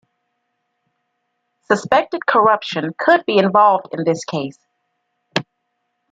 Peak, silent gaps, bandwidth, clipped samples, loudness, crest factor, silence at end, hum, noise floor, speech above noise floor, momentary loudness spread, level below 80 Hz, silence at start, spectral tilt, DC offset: -2 dBFS; none; 9.2 kHz; under 0.1%; -17 LUFS; 18 dB; 0.7 s; none; -72 dBFS; 56 dB; 11 LU; -62 dBFS; 1.7 s; -5 dB/octave; under 0.1%